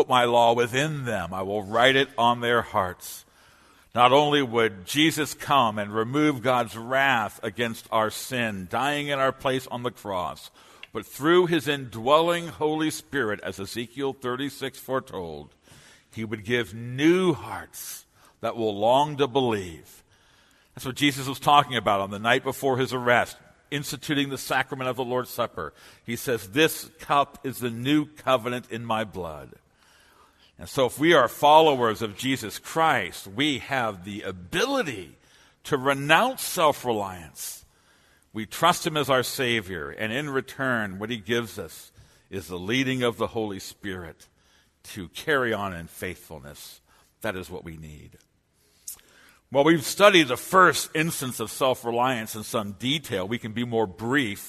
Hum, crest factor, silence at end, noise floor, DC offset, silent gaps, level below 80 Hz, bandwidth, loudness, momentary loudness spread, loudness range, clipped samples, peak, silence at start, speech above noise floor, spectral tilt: none; 24 dB; 0 s; -65 dBFS; under 0.1%; none; -60 dBFS; 13.5 kHz; -24 LUFS; 17 LU; 9 LU; under 0.1%; 0 dBFS; 0 s; 41 dB; -4 dB/octave